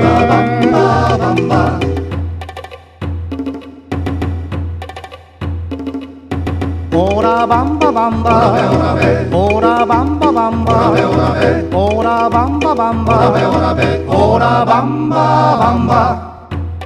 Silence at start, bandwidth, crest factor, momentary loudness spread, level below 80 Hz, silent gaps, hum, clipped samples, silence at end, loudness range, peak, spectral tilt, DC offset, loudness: 0 s; 10.5 kHz; 12 dB; 13 LU; -30 dBFS; none; none; under 0.1%; 0 s; 11 LU; 0 dBFS; -7.5 dB/octave; under 0.1%; -13 LUFS